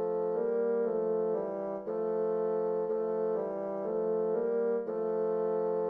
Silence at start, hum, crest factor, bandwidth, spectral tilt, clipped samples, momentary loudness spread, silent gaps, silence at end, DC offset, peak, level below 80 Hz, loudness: 0 s; none; 10 dB; 2.5 kHz; -10.5 dB/octave; under 0.1%; 4 LU; none; 0 s; under 0.1%; -22 dBFS; -76 dBFS; -32 LUFS